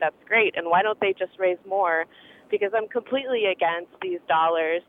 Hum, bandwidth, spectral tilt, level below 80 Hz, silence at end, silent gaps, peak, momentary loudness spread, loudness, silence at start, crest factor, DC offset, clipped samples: none; 3.9 kHz; -6.5 dB/octave; -76 dBFS; 0.1 s; none; -8 dBFS; 8 LU; -24 LUFS; 0 s; 16 dB; under 0.1%; under 0.1%